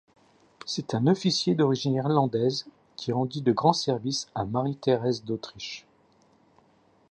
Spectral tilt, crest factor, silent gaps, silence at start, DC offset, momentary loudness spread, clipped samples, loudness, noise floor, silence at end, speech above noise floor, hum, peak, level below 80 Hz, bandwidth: -6 dB/octave; 22 dB; none; 0.65 s; under 0.1%; 13 LU; under 0.1%; -26 LUFS; -62 dBFS; 1.3 s; 37 dB; none; -6 dBFS; -64 dBFS; 9.8 kHz